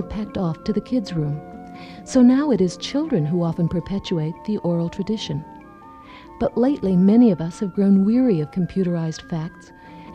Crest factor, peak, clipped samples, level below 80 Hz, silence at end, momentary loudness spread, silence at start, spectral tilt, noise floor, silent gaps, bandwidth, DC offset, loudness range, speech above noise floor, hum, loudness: 14 dB; -6 dBFS; under 0.1%; -48 dBFS; 0 s; 14 LU; 0 s; -7.5 dB/octave; -43 dBFS; none; 9.8 kHz; under 0.1%; 6 LU; 23 dB; none; -21 LUFS